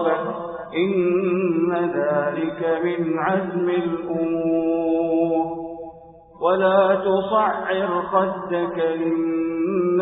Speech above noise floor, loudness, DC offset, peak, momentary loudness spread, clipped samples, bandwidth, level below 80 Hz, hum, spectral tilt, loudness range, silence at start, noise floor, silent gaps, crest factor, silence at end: 24 dB; -21 LUFS; under 0.1%; -6 dBFS; 6 LU; under 0.1%; 4 kHz; -58 dBFS; none; -11.5 dB/octave; 2 LU; 0 s; -45 dBFS; none; 16 dB; 0 s